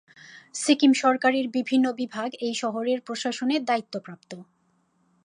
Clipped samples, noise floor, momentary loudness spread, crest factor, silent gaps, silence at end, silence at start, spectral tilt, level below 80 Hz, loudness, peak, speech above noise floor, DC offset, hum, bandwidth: under 0.1%; -68 dBFS; 18 LU; 18 dB; none; 0.8 s; 0.25 s; -3 dB/octave; -80 dBFS; -24 LUFS; -6 dBFS; 43 dB; under 0.1%; none; 11 kHz